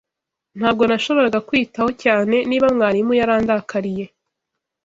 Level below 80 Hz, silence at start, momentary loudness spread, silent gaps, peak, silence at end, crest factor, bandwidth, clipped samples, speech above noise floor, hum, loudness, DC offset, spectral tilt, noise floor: -52 dBFS; 0.55 s; 8 LU; none; -2 dBFS; 0.8 s; 16 dB; 7.8 kHz; under 0.1%; 66 dB; none; -18 LUFS; under 0.1%; -6 dB/octave; -83 dBFS